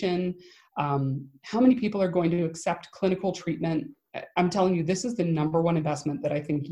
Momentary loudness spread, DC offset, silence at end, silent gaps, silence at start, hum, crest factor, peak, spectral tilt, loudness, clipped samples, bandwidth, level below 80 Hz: 9 LU; under 0.1%; 0 s; none; 0 s; none; 18 dB; -10 dBFS; -6.5 dB/octave; -27 LUFS; under 0.1%; 11 kHz; -62 dBFS